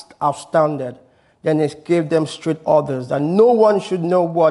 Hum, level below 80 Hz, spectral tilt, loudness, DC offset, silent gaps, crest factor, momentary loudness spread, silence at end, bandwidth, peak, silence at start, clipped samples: none; -62 dBFS; -7 dB/octave; -18 LUFS; under 0.1%; none; 16 dB; 9 LU; 0 s; 11.5 kHz; -2 dBFS; 0.2 s; under 0.1%